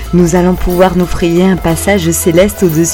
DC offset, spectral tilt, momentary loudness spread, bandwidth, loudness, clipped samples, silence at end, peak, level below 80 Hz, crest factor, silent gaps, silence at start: under 0.1%; -5.5 dB/octave; 3 LU; 17.5 kHz; -10 LUFS; 0.6%; 0 s; 0 dBFS; -24 dBFS; 10 dB; none; 0 s